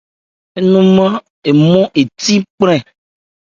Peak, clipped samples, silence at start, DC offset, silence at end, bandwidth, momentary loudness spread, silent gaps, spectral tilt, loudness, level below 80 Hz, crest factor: 0 dBFS; under 0.1%; 0.55 s; under 0.1%; 0.7 s; 7.6 kHz; 8 LU; 1.30-1.42 s, 2.50-2.58 s; -6 dB/octave; -12 LUFS; -52 dBFS; 12 dB